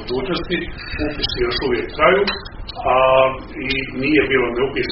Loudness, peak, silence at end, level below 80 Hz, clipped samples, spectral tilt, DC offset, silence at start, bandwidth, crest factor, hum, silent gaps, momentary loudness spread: -18 LUFS; 0 dBFS; 0 s; -34 dBFS; under 0.1%; -2.5 dB/octave; under 0.1%; 0 s; 6 kHz; 18 dB; none; none; 11 LU